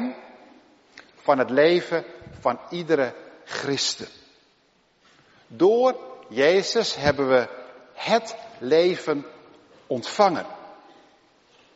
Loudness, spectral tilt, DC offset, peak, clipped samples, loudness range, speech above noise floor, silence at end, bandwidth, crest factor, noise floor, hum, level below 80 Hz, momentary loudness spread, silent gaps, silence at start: -23 LUFS; -3 dB/octave; under 0.1%; -4 dBFS; under 0.1%; 5 LU; 41 dB; 1 s; 8 kHz; 22 dB; -63 dBFS; none; -62 dBFS; 20 LU; none; 0 s